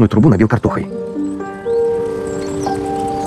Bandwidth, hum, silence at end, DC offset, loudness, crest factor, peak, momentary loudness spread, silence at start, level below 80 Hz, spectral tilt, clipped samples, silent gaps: 12.5 kHz; none; 0 s; under 0.1%; -17 LUFS; 14 dB; -2 dBFS; 11 LU; 0 s; -42 dBFS; -8 dB/octave; under 0.1%; none